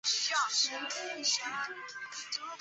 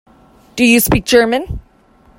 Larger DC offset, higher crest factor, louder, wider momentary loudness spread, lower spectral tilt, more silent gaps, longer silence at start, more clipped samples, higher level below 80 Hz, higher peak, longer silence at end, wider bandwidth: neither; about the same, 18 dB vs 14 dB; second, -32 LUFS vs -12 LUFS; second, 12 LU vs 19 LU; second, 2 dB/octave vs -4 dB/octave; neither; second, 0.05 s vs 0.55 s; neither; second, -86 dBFS vs -32 dBFS; second, -18 dBFS vs 0 dBFS; second, 0 s vs 0.6 s; second, 8.4 kHz vs 16.5 kHz